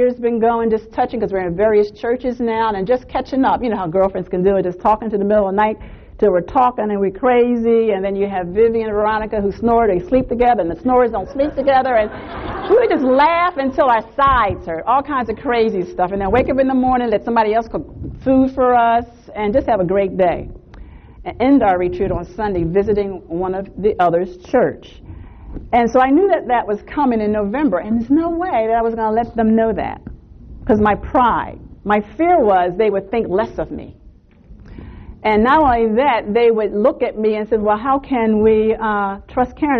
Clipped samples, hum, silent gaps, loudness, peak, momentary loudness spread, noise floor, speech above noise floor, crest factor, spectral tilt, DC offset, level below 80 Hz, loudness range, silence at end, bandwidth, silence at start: under 0.1%; none; none; -16 LUFS; -4 dBFS; 8 LU; -45 dBFS; 29 dB; 12 dB; -8 dB/octave; under 0.1%; -38 dBFS; 3 LU; 0 s; 6.4 kHz; 0 s